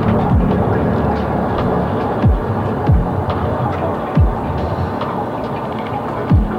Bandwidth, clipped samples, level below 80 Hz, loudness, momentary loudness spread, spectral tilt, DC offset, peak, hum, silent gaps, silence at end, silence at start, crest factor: 6.6 kHz; under 0.1%; -24 dBFS; -17 LUFS; 7 LU; -9.5 dB/octave; under 0.1%; -2 dBFS; none; none; 0 s; 0 s; 14 dB